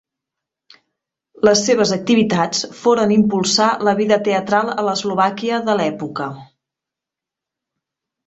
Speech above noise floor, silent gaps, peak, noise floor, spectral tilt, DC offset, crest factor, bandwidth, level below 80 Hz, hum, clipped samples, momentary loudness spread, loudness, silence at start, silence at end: 69 dB; none; -2 dBFS; -86 dBFS; -4 dB/octave; under 0.1%; 18 dB; 8.2 kHz; -58 dBFS; none; under 0.1%; 6 LU; -17 LUFS; 1.45 s; 1.85 s